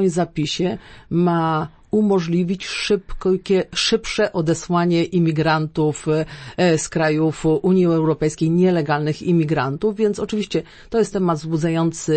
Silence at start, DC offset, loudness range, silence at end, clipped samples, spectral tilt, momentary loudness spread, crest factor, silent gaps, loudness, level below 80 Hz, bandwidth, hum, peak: 0 s; under 0.1%; 2 LU; 0 s; under 0.1%; -6 dB/octave; 6 LU; 14 dB; none; -20 LUFS; -44 dBFS; 8.8 kHz; none; -6 dBFS